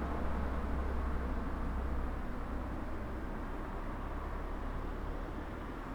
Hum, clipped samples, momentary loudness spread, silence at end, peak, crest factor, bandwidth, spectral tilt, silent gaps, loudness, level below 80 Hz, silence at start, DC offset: none; under 0.1%; 4 LU; 0 s; -22 dBFS; 14 dB; 10.5 kHz; -8 dB/octave; none; -41 LUFS; -40 dBFS; 0 s; under 0.1%